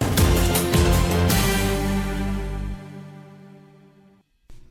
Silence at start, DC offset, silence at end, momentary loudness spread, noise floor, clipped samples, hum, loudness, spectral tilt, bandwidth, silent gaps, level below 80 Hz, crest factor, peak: 0 s; under 0.1%; 0.05 s; 18 LU; -56 dBFS; under 0.1%; none; -21 LUFS; -5 dB/octave; 16 kHz; none; -28 dBFS; 16 dB; -6 dBFS